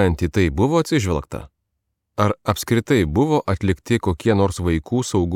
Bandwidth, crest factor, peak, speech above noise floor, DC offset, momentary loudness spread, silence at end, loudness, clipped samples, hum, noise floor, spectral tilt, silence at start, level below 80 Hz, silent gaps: 16.5 kHz; 16 dB; -4 dBFS; 57 dB; under 0.1%; 6 LU; 0 s; -20 LUFS; under 0.1%; none; -76 dBFS; -6.5 dB/octave; 0 s; -38 dBFS; none